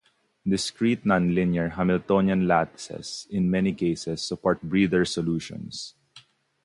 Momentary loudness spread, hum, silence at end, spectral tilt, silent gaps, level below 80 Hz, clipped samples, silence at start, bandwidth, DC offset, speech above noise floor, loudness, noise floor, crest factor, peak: 13 LU; none; 0.45 s; -6 dB/octave; none; -52 dBFS; under 0.1%; 0.45 s; 11.5 kHz; under 0.1%; 31 dB; -25 LUFS; -55 dBFS; 18 dB; -8 dBFS